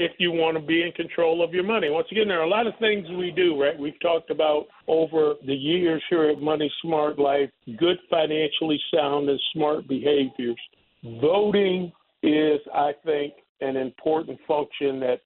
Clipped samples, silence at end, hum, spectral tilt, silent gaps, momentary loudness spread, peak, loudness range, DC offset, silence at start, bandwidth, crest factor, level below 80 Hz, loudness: under 0.1%; 0.1 s; none; -9.5 dB/octave; 13.49-13.55 s; 6 LU; -8 dBFS; 1 LU; under 0.1%; 0 s; 4.2 kHz; 16 dB; -66 dBFS; -24 LUFS